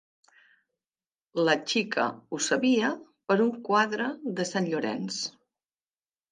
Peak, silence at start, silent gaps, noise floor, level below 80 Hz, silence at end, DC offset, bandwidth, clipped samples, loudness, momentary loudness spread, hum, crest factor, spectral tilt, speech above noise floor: -8 dBFS; 1.35 s; none; under -90 dBFS; -80 dBFS; 1 s; under 0.1%; 10 kHz; under 0.1%; -27 LUFS; 8 LU; none; 22 dB; -4 dB/octave; over 63 dB